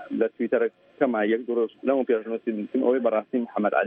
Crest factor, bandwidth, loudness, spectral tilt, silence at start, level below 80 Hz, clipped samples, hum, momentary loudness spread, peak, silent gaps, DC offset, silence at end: 18 dB; 3.8 kHz; -25 LUFS; -9.5 dB/octave; 0 s; -74 dBFS; under 0.1%; none; 6 LU; -6 dBFS; none; under 0.1%; 0 s